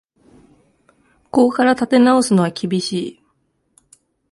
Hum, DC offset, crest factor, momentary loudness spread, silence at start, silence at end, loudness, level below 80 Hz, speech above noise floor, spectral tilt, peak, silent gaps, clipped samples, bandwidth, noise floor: none; under 0.1%; 16 dB; 11 LU; 1.35 s; 1.2 s; -16 LUFS; -60 dBFS; 51 dB; -5.5 dB/octave; -2 dBFS; none; under 0.1%; 11.5 kHz; -66 dBFS